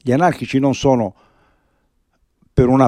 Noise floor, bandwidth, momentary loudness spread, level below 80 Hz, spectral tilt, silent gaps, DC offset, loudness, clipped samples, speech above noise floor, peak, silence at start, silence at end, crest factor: -64 dBFS; 10 kHz; 6 LU; -38 dBFS; -7 dB/octave; none; under 0.1%; -17 LUFS; under 0.1%; 49 dB; -2 dBFS; 0.05 s; 0 s; 16 dB